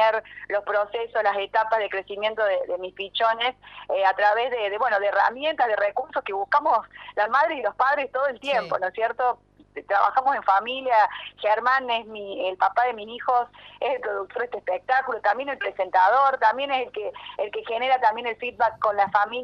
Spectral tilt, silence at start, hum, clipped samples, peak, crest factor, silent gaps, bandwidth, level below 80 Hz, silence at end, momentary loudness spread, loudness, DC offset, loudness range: -4 dB/octave; 0 s; 50 Hz at -65 dBFS; under 0.1%; -6 dBFS; 18 dB; none; 7 kHz; -64 dBFS; 0 s; 9 LU; -24 LUFS; under 0.1%; 2 LU